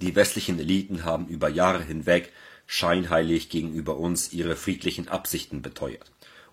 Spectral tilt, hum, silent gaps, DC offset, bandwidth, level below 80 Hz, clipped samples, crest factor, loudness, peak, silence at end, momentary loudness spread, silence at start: -4.5 dB/octave; none; none; under 0.1%; 16 kHz; -48 dBFS; under 0.1%; 22 dB; -26 LUFS; -4 dBFS; 0.1 s; 11 LU; 0 s